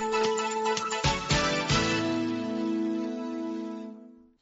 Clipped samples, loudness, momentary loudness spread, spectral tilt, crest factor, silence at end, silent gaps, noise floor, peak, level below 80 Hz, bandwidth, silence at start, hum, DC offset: under 0.1%; -28 LUFS; 10 LU; -3.5 dB/octave; 18 dB; 0.25 s; none; -49 dBFS; -12 dBFS; -46 dBFS; 8 kHz; 0 s; none; under 0.1%